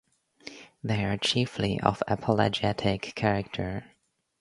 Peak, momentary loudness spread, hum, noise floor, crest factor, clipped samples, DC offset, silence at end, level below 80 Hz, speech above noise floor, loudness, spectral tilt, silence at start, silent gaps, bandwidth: -2 dBFS; 16 LU; none; -49 dBFS; 26 dB; under 0.1%; under 0.1%; 0.6 s; -52 dBFS; 22 dB; -28 LUFS; -5.5 dB/octave; 0.45 s; none; 11.5 kHz